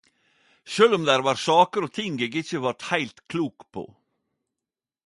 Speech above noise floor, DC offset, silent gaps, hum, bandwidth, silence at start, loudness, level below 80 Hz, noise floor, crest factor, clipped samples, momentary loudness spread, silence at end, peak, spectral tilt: 66 dB; under 0.1%; none; none; 11.5 kHz; 0.65 s; -23 LUFS; -70 dBFS; -89 dBFS; 22 dB; under 0.1%; 17 LU; 1.2 s; -4 dBFS; -4.5 dB/octave